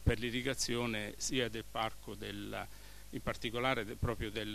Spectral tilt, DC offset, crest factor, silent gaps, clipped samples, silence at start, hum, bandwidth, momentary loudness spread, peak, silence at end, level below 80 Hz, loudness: -4 dB/octave; 0.2%; 22 dB; none; under 0.1%; 0 s; none; 14 kHz; 10 LU; -16 dBFS; 0 s; -48 dBFS; -38 LUFS